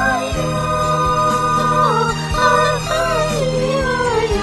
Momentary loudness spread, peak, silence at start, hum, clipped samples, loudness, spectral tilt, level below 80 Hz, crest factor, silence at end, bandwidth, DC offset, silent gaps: 4 LU; -2 dBFS; 0 s; none; under 0.1%; -16 LUFS; -4.5 dB/octave; -32 dBFS; 14 dB; 0 s; 12.5 kHz; 0.2%; none